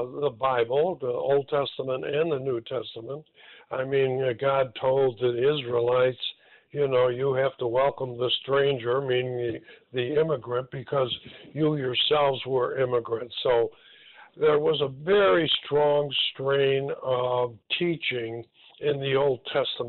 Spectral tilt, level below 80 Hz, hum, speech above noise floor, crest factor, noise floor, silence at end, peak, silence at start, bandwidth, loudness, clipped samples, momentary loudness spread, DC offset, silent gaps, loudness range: -10 dB/octave; -64 dBFS; none; 26 dB; 14 dB; -52 dBFS; 0 s; -12 dBFS; 0 s; 4.4 kHz; -26 LUFS; under 0.1%; 9 LU; under 0.1%; none; 4 LU